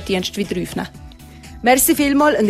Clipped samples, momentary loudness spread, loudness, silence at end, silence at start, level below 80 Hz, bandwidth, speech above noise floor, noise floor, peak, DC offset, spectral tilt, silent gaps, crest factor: under 0.1%; 14 LU; -17 LUFS; 0 s; 0 s; -42 dBFS; 15 kHz; 21 dB; -38 dBFS; 0 dBFS; under 0.1%; -3.5 dB/octave; none; 16 dB